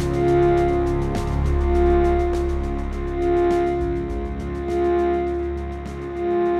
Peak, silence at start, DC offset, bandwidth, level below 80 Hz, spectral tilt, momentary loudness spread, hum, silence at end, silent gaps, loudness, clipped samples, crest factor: -8 dBFS; 0 s; under 0.1%; 9.4 kHz; -26 dBFS; -8.5 dB/octave; 10 LU; none; 0 s; none; -22 LUFS; under 0.1%; 12 dB